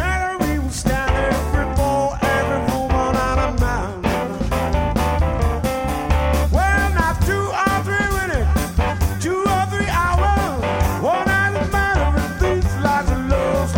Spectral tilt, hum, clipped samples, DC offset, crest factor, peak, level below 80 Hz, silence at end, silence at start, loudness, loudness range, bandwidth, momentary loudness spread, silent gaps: -6 dB/octave; none; under 0.1%; under 0.1%; 16 dB; -2 dBFS; -24 dBFS; 0 s; 0 s; -19 LUFS; 1 LU; 17 kHz; 4 LU; none